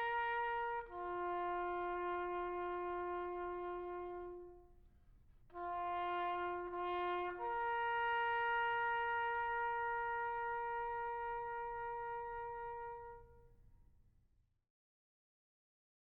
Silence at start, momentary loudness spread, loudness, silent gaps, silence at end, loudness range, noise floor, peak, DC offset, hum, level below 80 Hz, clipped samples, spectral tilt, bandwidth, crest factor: 0 s; 10 LU; -41 LUFS; none; 2.3 s; 10 LU; -75 dBFS; -30 dBFS; under 0.1%; none; -66 dBFS; under 0.1%; -1.5 dB/octave; 5 kHz; 14 dB